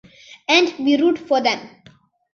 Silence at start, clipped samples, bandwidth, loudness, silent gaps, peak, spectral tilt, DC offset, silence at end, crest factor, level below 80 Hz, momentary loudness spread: 0.5 s; under 0.1%; 7.2 kHz; -18 LUFS; none; -2 dBFS; -3 dB/octave; under 0.1%; 0.65 s; 18 dB; -66 dBFS; 9 LU